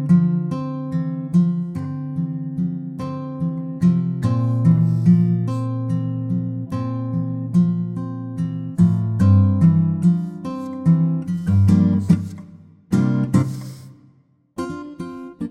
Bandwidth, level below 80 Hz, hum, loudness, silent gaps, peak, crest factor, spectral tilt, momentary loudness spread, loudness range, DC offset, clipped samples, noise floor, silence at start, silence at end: 8.8 kHz; -52 dBFS; none; -20 LUFS; none; -4 dBFS; 16 dB; -9.5 dB/octave; 13 LU; 5 LU; under 0.1%; under 0.1%; -56 dBFS; 0 s; 0 s